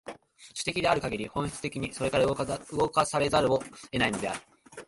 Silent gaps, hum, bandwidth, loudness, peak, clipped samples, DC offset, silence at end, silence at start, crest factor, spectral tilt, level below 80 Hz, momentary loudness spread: none; none; 11.5 kHz; -29 LUFS; -10 dBFS; under 0.1%; under 0.1%; 0.05 s; 0.05 s; 20 dB; -4.5 dB/octave; -52 dBFS; 12 LU